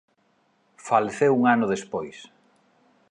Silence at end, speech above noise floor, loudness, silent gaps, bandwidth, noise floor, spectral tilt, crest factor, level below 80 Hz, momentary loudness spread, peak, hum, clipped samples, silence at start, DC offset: 0.85 s; 44 dB; -23 LUFS; none; 10.5 kHz; -66 dBFS; -6 dB/octave; 22 dB; -68 dBFS; 21 LU; -4 dBFS; none; under 0.1%; 0.85 s; under 0.1%